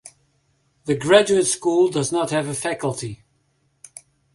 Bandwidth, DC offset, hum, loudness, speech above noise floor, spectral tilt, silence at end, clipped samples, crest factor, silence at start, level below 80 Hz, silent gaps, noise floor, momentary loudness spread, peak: 11.5 kHz; under 0.1%; none; -20 LUFS; 47 dB; -4 dB/octave; 1.2 s; under 0.1%; 20 dB; 0.05 s; -60 dBFS; none; -66 dBFS; 21 LU; -2 dBFS